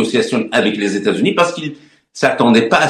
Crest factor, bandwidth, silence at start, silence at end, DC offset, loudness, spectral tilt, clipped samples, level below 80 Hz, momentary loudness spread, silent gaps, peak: 14 dB; 12 kHz; 0 s; 0 s; under 0.1%; -15 LUFS; -4.5 dB/octave; under 0.1%; -56 dBFS; 6 LU; none; 0 dBFS